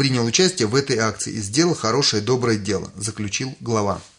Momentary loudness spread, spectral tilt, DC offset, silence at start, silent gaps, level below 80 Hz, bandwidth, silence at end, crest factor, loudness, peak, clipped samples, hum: 8 LU; -4 dB/octave; under 0.1%; 0 s; none; -56 dBFS; 11 kHz; 0.1 s; 18 dB; -20 LUFS; -4 dBFS; under 0.1%; none